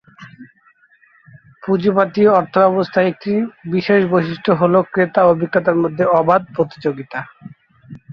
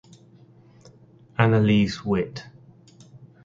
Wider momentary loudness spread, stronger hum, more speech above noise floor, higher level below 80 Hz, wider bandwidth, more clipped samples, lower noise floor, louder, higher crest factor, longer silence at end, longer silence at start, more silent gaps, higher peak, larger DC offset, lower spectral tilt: second, 9 LU vs 15 LU; neither; first, 39 dB vs 31 dB; second, -58 dBFS vs -52 dBFS; second, 6.2 kHz vs 7.6 kHz; neither; about the same, -54 dBFS vs -52 dBFS; first, -16 LUFS vs -22 LUFS; second, 16 dB vs 24 dB; second, 0 s vs 0.3 s; second, 0.2 s vs 1.4 s; neither; about the same, -2 dBFS vs 0 dBFS; neither; first, -9 dB/octave vs -7.5 dB/octave